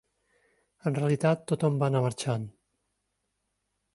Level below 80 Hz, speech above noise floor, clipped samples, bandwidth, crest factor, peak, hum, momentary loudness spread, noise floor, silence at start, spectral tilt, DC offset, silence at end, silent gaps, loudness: -68 dBFS; 53 dB; under 0.1%; 11.5 kHz; 20 dB; -12 dBFS; none; 9 LU; -80 dBFS; 0.85 s; -7 dB/octave; under 0.1%; 1.45 s; none; -28 LUFS